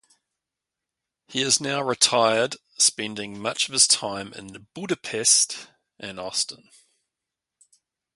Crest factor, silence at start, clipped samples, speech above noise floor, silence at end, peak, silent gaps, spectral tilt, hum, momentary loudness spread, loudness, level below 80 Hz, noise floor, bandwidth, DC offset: 26 dB; 1.3 s; under 0.1%; 62 dB; 1.6 s; -2 dBFS; none; -1 dB/octave; none; 19 LU; -21 LUFS; -68 dBFS; -87 dBFS; 12 kHz; under 0.1%